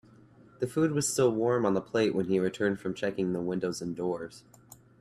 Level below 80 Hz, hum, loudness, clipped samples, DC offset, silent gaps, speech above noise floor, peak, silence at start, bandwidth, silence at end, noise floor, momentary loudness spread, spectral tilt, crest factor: -66 dBFS; none; -29 LUFS; under 0.1%; under 0.1%; none; 27 dB; -14 dBFS; 0.6 s; 14.5 kHz; 0.6 s; -56 dBFS; 8 LU; -5.5 dB/octave; 16 dB